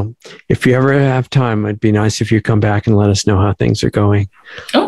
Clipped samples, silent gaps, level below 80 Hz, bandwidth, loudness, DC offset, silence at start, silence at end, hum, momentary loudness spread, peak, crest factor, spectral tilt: under 0.1%; none; -40 dBFS; 12 kHz; -14 LUFS; under 0.1%; 0 s; 0 s; none; 5 LU; 0 dBFS; 12 dB; -6.5 dB/octave